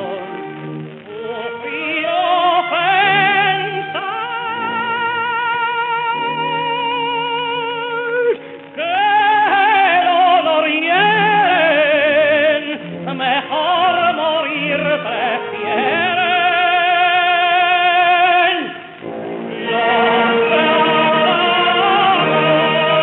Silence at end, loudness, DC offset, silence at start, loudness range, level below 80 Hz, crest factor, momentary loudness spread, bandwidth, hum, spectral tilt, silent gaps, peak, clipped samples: 0 s; -15 LUFS; under 0.1%; 0 s; 6 LU; -68 dBFS; 12 dB; 13 LU; 4.2 kHz; none; -1 dB/octave; none; -2 dBFS; under 0.1%